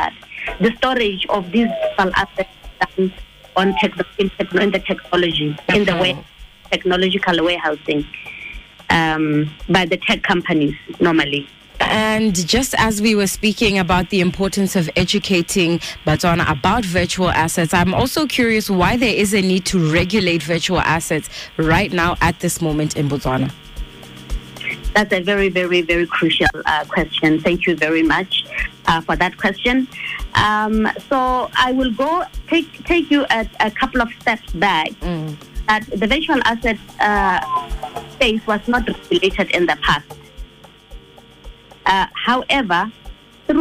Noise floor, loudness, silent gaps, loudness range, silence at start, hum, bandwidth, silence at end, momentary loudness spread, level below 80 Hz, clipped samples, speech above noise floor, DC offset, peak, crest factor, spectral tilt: -43 dBFS; -17 LUFS; none; 3 LU; 0 s; none; 15.5 kHz; 0 s; 8 LU; -36 dBFS; under 0.1%; 25 dB; under 0.1%; -4 dBFS; 14 dB; -4.5 dB/octave